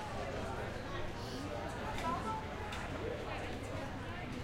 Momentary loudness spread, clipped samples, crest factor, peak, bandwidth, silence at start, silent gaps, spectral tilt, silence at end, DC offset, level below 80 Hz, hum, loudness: 4 LU; under 0.1%; 16 dB; -26 dBFS; 16.5 kHz; 0 s; none; -5.5 dB/octave; 0 s; under 0.1%; -52 dBFS; none; -41 LUFS